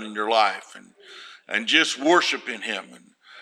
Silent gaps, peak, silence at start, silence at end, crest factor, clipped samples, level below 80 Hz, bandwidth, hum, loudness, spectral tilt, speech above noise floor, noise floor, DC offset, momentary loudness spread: none; -2 dBFS; 0 s; 0 s; 22 dB; under 0.1%; -84 dBFS; 13.5 kHz; none; -22 LUFS; -1.5 dB/octave; 22 dB; -45 dBFS; under 0.1%; 21 LU